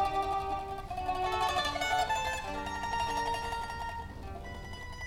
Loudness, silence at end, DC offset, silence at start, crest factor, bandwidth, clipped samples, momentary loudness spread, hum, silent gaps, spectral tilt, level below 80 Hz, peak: -34 LUFS; 0 s; under 0.1%; 0 s; 16 dB; 17 kHz; under 0.1%; 13 LU; none; none; -3.5 dB/octave; -46 dBFS; -18 dBFS